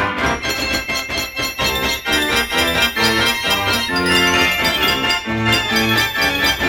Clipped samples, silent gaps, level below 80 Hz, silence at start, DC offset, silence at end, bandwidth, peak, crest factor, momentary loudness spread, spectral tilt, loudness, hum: under 0.1%; none; -36 dBFS; 0 s; under 0.1%; 0 s; 19 kHz; -2 dBFS; 14 dB; 5 LU; -2.5 dB/octave; -16 LUFS; none